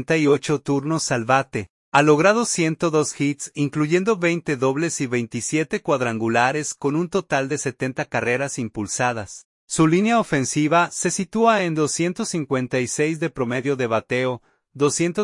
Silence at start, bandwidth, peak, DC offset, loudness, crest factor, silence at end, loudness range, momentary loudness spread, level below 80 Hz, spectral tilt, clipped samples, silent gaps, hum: 0 s; 11.5 kHz; -2 dBFS; under 0.1%; -21 LUFS; 20 dB; 0 s; 3 LU; 7 LU; -60 dBFS; -4.5 dB/octave; under 0.1%; 1.70-1.92 s, 9.45-9.68 s; none